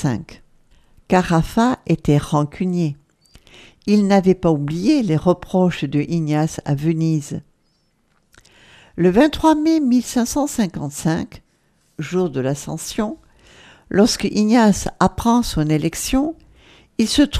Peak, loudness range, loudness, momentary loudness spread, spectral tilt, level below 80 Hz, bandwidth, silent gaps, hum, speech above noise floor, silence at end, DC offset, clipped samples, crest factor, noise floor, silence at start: 0 dBFS; 5 LU; -18 LUFS; 11 LU; -6 dB/octave; -40 dBFS; 15.5 kHz; none; none; 45 dB; 0 s; under 0.1%; under 0.1%; 18 dB; -63 dBFS; 0 s